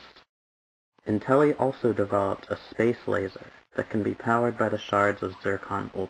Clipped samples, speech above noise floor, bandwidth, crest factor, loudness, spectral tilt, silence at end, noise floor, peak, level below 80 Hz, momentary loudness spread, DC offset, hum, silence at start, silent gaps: under 0.1%; over 64 dB; 10.5 kHz; 20 dB; -27 LUFS; -7.5 dB/octave; 0 s; under -90 dBFS; -8 dBFS; -64 dBFS; 11 LU; under 0.1%; none; 0.05 s; 0.29-0.92 s